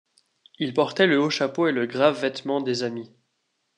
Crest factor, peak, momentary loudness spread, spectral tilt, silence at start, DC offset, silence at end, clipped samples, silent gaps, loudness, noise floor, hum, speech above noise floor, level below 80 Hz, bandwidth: 20 dB; -4 dBFS; 9 LU; -5 dB/octave; 0.6 s; under 0.1%; 0.7 s; under 0.1%; none; -23 LUFS; -75 dBFS; none; 52 dB; -78 dBFS; 10.5 kHz